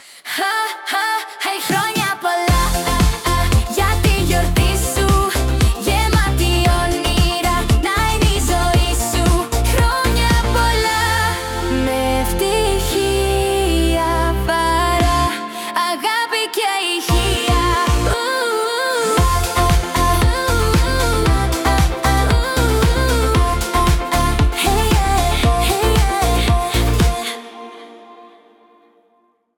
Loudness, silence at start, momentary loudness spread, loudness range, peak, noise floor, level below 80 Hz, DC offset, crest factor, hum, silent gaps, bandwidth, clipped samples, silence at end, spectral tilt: -17 LUFS; 0.1 s; 3 LU; 1 LU; -2 dBFS; -60 dBFS; -20 dBFS; under 0.1%; 14 dB; none; none; 18 kHz; under 0.1%; 1.3 s; -4.5 dB/octave